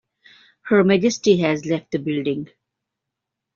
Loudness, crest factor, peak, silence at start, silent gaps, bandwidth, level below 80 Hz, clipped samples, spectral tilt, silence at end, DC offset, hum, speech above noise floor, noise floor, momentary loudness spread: -20 LUFS; 18 dB; -4 dBFS; 0.65 s; none; 7.4 kHz; -62 dBFS; under 0.1%; -5.5 dB/octave; 1.1 s; under 0.1%; none; 64 dB; -83 dBFS; 13 LU